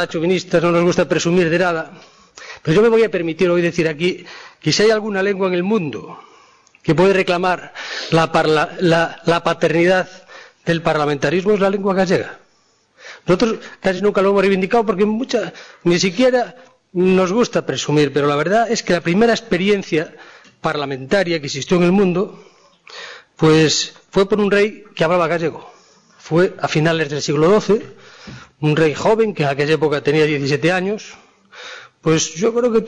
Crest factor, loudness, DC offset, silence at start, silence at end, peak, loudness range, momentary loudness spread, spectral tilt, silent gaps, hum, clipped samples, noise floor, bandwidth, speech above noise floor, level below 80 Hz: 12 dB; -17 LUFS; under 0.1%; 0 s; 0 s; -6 dBFS; 2 LU; 13 LU; -5 dB/octave; none; none; under 0.1%; -58 dBFS; 10.5 kHz; 42 dB; -50 dBFS